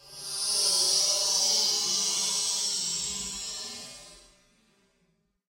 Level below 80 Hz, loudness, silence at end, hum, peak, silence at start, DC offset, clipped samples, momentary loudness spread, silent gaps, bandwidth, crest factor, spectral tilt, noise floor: -64 dBFS; -25 LUFS; 1.3 s; none; -12 dBFS; 0.05 s; under 0.1%; under 0.1%; 14 LU; none; 16 kHz; 18 dB; 1.5 dB/octave; -72 dBFS